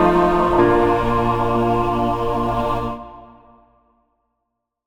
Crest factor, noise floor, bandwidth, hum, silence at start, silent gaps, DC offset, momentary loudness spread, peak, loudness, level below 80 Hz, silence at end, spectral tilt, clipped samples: 16 dB; -77 dBFS; 16 kHz; none; 0 s; none; under 0.1%; 10 LU; -2 dBFS; -18 LUFS; -34 dBFS; 1.6 s; -7.5 dB/octave; under 0.1%